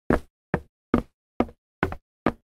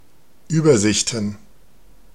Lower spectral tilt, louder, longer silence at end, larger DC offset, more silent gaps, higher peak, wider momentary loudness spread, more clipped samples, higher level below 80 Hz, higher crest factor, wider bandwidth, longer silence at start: first, -8 dB/octave vs -4.5 dB/octave; second, -30 LUFS vs -18 LUFS; second, 0.15 s vs 0.8 s; second, under 0.1% vs 0.8%; first, 0.30-0.53 s, 0.69-0.93 s, 1.14-1.40 s, 1.58-1.82 s, 2.02-2.26 s vs none; about the same, -4 dBFS vs -2 dBFS; second, 5 LU vs 11 LU; neither; first, -40 dBFS vs -52 dBFS; first, 24 dB vs 18 dB; about the same, 14 kHz vs 13.5 kHz; second, 0.1 s vs 0.5 s